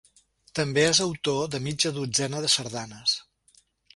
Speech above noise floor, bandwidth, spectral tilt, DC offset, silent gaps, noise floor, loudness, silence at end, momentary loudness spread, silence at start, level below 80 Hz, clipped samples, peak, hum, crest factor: 37 dB; 11.5 kHz; -3 dB/octave; under 0.1%; none; -63 dBFS; -25 LUFS; 0.75 s; 9 LU; 0.55 s; -60 dBFS; under 0.1%; -8 dBFS; none; 20 dB